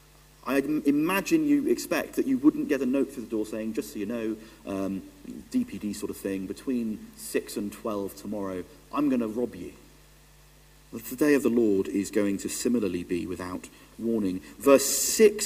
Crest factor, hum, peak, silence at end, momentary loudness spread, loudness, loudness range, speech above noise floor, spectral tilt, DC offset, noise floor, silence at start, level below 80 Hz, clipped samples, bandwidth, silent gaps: 22 dB; none; -6 dBFS; 0 s; 15 LU; -27 LUFS; 7 LU; 28 dB; -4 dB/octave; under 0.1%; -55 dBFS; 0.45 s; -58 dBFS; under 0.1%; 16 kHz; none